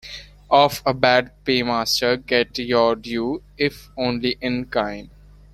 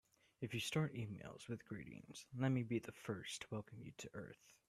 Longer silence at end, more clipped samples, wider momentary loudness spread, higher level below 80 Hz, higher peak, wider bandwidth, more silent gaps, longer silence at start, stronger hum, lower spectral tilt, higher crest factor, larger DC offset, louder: first, 0.45 s vs 0.15 s; neither; second, 9 LU vs 14 LU; first, -48 dBFS vs -76 dBFS; first, -2 dBFS vs -28 dBFS; about the same, 14 kHz vs 14 kHz; neither; second, 0.05 s vs 0.4 s; first, 50 Hz at -45 dBFS vs none; second, -4 dB/octave vs -5.5 dB/octave; about the same, 20 dB vs 18 dB; neither; first, -20 LUFS vs -46 LUFS